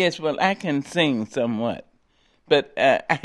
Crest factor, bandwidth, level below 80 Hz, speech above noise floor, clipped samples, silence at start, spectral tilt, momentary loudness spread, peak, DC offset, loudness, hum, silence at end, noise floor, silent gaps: 22 dB; 12 kHz; -64 dBFS; 41 dB; under 0.1%; 0 s; -5 dB/octave; 7 LU; -2 dBFS; under 0.1%; -22 LUFS; none; 0.05 s; -63 dBFS; none